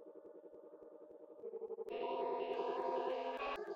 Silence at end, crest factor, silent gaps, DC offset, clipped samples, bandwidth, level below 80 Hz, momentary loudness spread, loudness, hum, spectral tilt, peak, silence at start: 0 s; 16 dB; none; under 0.1%; under 0.1%; 7.6 kHz; -78 dBFS; 18 LU; -42 LUFS; none; -5 dB/octave; -28 dBFS; 0 s